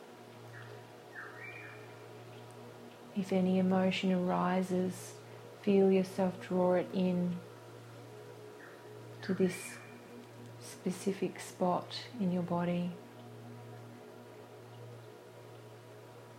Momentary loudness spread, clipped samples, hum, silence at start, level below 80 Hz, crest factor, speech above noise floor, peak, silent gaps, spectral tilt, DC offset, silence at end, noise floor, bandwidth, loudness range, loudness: 21 LU; under 0.1%; none; 0 s; -76 dBFS; 18 dB; 20 dB; -18 dBFS; none; -6.5 dB/octave; under 0.1%; 0 s; -53 dBFS; 15 kHz; 10 LU; -34 LUFS